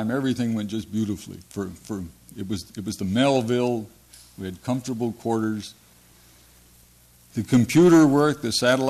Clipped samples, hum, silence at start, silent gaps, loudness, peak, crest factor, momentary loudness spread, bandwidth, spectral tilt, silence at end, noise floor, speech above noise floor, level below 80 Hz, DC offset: under 0.1%; 60 Hz at -55 dBFS; 0 s; none; -23 LUFS; -8 dBFS; 14 dB; 18 LU; 14 kHz; -5.5 dB/octave; 0 s; -54 dBFS; 32 dB; -56 dBFS; under 0.1%